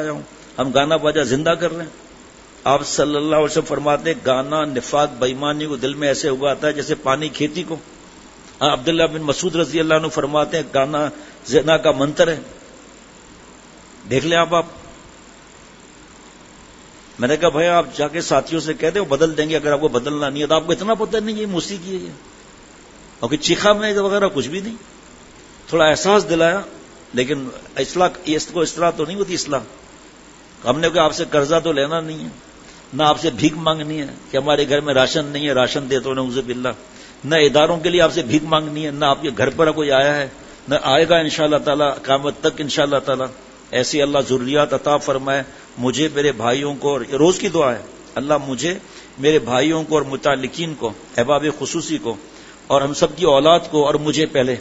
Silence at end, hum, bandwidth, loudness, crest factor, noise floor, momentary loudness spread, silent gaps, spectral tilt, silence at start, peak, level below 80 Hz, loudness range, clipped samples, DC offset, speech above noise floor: 0 s; none; 8 kHz; -18 LUFS; 18 dB; -43 dBFS; 10 LU; none; -4 dB/octave; 0 s; 0 dBFS; -48 dBFS; 4 LU; under 0.1%; under 0.1%; 25 dB